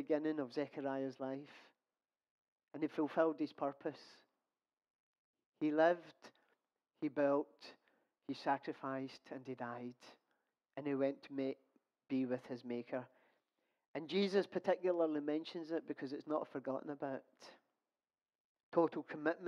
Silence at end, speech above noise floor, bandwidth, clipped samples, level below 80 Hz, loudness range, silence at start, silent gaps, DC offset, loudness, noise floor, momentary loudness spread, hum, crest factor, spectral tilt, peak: 0 s; over 50 dB; 9.8 kHz; under 0.1%; under -90 dBFS; 5 LU; 0 s; 2.31-2.56 s, 4.90-5.34 s, 5.46-5.52 s, 13.88-13.94 s, 18.35-18.55 s, 18.63-18.72 s; under 0.1%; -40 LUFS; under -90 dBFS; 16 LU; none; 20 dB; -7 dB/octave; -20 dBFS